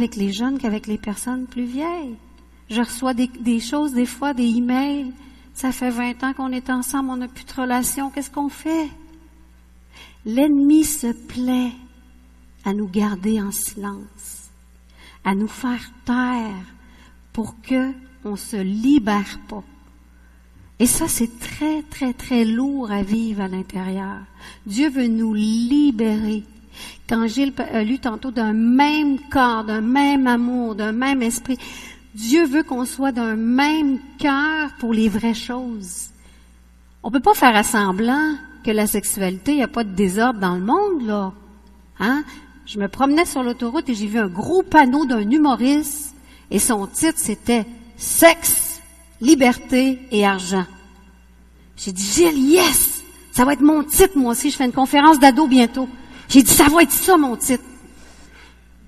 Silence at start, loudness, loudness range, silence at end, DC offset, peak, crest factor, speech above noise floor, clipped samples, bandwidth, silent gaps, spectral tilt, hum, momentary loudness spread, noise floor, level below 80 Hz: 0 s; -19 LUFS; 10 LU; 0.6 s; under 0.1%; 0 dBFS; 20 dB; 30 dB; under 0.1%; 13.5 kHz; none; -3.5 dB/octave; none; 16 LU; -49 dBFS; -44 dBFS